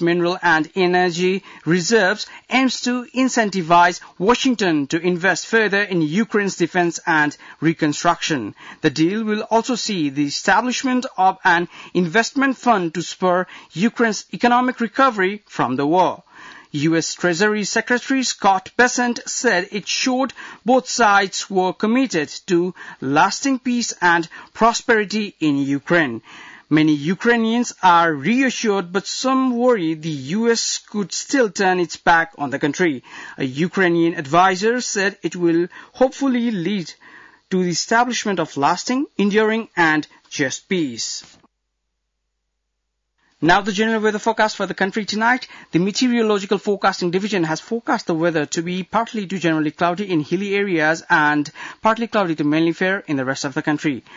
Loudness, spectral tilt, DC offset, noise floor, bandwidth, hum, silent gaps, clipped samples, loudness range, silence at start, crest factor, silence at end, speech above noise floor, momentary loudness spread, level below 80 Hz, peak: -19 LUFS; -4 dB/octave; under 0.1%; -75 dBFS; 7.8 kHz; none; none; under 0.1%; 3 LU; 0 s; 14 dB; 0 s; 56 dB; 7 LU; -58 dBFS; -4 dBFS